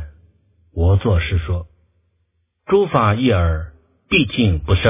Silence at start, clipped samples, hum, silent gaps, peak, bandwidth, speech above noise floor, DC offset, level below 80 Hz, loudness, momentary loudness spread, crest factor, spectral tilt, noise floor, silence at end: 0 s; under 0.1%; none; none; 0 dBFS; 3.8 kHz; 51 dB; under 0.1%; -26 dBFS; -18 LUFS; 11 LU; 18 dB; -11 dB/octave; -67 dBFS; 0 s